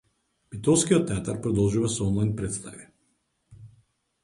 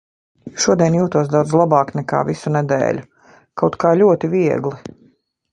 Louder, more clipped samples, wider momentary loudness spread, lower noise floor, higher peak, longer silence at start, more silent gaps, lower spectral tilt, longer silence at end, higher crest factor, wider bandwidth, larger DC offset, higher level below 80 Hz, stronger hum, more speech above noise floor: second, -25 LUFS vs -17 LUFS; neither; about the same, 13 LU vs 11 LU; first, -72 dBFS vs -56 dBFS; second, -8 dBFS vs 0 dBFS; about the same, 0.5 s vs 0.45 s; neither; about the same, -5.5 dB/octave vs -6 dB/octave; about the same, 0.55 s vs 0.65 s; about the same, 20 dB vs 16 dB; about the same, 11.5 kHz vs 10.5 kHz; neither; first, -48 dBFS vs -54 dBFS; neither; first, 48 dB vs 40 dB